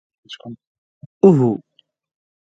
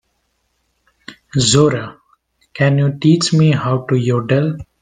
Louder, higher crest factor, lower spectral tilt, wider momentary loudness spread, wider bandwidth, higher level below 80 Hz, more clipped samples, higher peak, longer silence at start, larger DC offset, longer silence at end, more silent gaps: about the same, -15 LUFS vs -15 LUFS; about the same, 20 dB vs 16 dB; first, -9.5 dB/octave vs -5.5 dB/octave; first, 25 LU vs 10 LU; second, 7.8 kHz vs 9.8 kHz; second, -62 dBFS vs -48 dBFS; neither; about the same, 0 dBFS vs 0 dBFS; second, 0.3 s vs 1.1 s; neither; first, 0.95 s vs 0.2 s; first, 0.67-1.21 s vs none